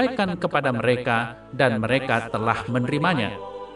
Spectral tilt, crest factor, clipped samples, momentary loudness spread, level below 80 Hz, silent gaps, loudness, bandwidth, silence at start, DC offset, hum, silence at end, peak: -6.5 dB/octave; 20 dB; under 0.1%; 4 LU; -52 dBFS; none; -23 LUFS; 11.5 kHz; 0 s; under 0.1%; none; 0 s; -4 dBFS